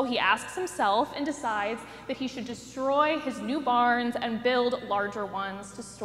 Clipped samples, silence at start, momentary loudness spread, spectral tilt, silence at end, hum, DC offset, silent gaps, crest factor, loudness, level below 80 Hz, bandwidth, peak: under 0.1%; 0 s; 12 LU; -3.5 dB/octave; 0 s; none; under 0.1%; none; 18 dB; -28 LUFS; -62 dBFS; 15 kHz; -10 dBFS